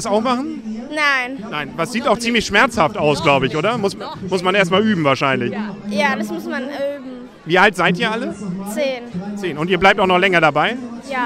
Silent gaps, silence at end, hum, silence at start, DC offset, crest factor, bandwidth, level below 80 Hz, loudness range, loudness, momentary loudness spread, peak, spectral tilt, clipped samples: none; 0 s; none; 0 s; under 0.1%; 18 dB; 15 kHz; -48 dBFS; 3 LU; -17 LUFS; 12 LU; 0 dBFS; -4.5 dB/octave; under 0.1%